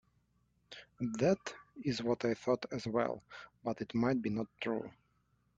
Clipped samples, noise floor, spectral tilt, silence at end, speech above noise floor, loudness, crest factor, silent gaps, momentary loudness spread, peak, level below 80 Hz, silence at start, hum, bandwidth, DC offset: under 0.1%; -75 dBFS; -6 dB/octave; 0.65 s; 40 dB; -36 LUFS; 20 dB; none; 16 LU; -18 dBFS; -68 dBFS; 0.7 s; 60 Hz at -60 dBFS; 7.8 kHz; under 0.1%